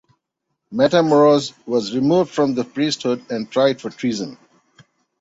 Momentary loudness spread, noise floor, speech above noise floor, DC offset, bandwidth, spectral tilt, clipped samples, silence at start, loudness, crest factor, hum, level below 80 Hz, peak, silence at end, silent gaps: 11 LU; -76 dBFS; 59 dB; under 0.1%; 8 kHz; -5.5 dB/octave; under 0.1%; 0.7 s; -18 LUFS; 18 dB; none; -62 dBFS; -2 dBFS; 0.85 s; none